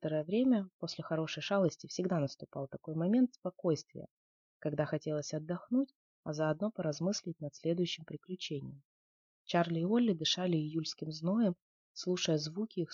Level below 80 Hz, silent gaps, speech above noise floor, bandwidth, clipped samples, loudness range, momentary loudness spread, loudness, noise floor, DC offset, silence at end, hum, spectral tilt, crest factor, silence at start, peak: -76 dBFS; 0.73-0.80 s, 3.38-3.42 s, 4.11-4.60 s, 5.95-6.23 s, 8.85-9.45 s, 11.62-11.95 s; over 55 dB; 7.4 kHz; under 0.1%; 4 LU; 12 LU; -35 LUFS; under -90 dBFS; under 0.1%; 0 s; none; -5.5 dB/octave; 16 dB; 0 s; -18 dBFS